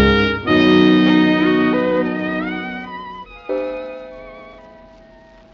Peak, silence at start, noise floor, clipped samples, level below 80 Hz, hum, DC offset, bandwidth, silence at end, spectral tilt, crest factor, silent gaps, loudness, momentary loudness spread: -2 dBFS; 0 s; -45 dBFS; under 0.1%; -36 dBFS; none; under 0.1%; 6.6 kHz; 0.9 s; -4.5 dB/octave; 16 dB; none; -16 LUFS; 22 LU